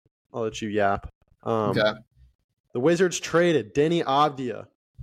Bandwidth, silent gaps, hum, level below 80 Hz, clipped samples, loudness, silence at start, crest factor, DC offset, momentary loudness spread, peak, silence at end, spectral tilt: 14.5 kHz; 1.15-1.21 s, 2.35-2.49 s, 2.60-2.64 s, 4.75-4.94 s; none; -54 dBFS; under 0.1%; -24 LUFS; 0.35 s; 16 dB; under 0.1%; 14 LU; -8 dBFS; 0 s; -5 dB/octave